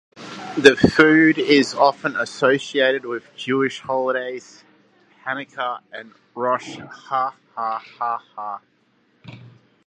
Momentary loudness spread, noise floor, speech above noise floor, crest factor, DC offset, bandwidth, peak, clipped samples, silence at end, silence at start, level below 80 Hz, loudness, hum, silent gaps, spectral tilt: 21 LU; -62 dBFS; 42 dB; 20 dB; under 0.1%; 11 kHz; 0 dBFS; under 0.1%; 0.4 s; 0.15 s; -54 dBFS; -19 LUFS; none; none; -5 dB/octave